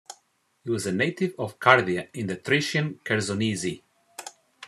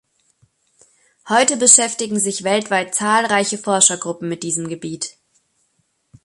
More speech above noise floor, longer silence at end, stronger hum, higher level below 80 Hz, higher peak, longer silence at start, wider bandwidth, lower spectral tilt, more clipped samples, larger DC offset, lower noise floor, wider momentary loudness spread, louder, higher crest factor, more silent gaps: second, 43 dB vs 49 dB; second, 0 s vs 1.15 s; neither; about the same, -68 dBFS vs -66 dBFS; about the same, 0 dBFS vs 0 dBFS; second, 0.1 s vs 1.25 s; about the same, 13.5 kHz vs 14 kHz; first, -4.5 dB/octave vs -2 dB/octave; neither; neither; about the same, -68 dBFS vs -67 dBFS; first, 22 LU vs 16 LU; second, -25 LUFS vs -16 LUFS; first, 26 dB vs 20 dB; neither